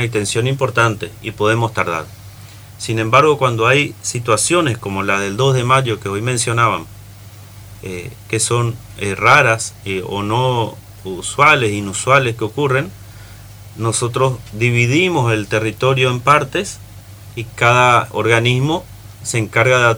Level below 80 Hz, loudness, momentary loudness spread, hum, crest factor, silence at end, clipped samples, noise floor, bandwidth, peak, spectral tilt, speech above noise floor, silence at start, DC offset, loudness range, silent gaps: -46 dBFS; -15 LUFS; 16 LU; none; 16 dB; 0 s; under 0.1%; -37 dBFS; over 20 kHz; 0 dBFS; -4.5 dB/octave; 21 dB; 0 s; under 0.1%; 3 LU; none